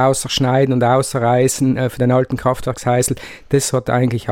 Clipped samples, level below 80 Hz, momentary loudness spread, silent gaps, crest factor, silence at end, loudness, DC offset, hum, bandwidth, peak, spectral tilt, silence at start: under 0.1%; -42 dBFS; 5 LU; none; 14 dB; 0 s; -16 LUFS; under 0.1%; none; 16.5 kHz; -2 dBFS; -5 dB/octave; 0 s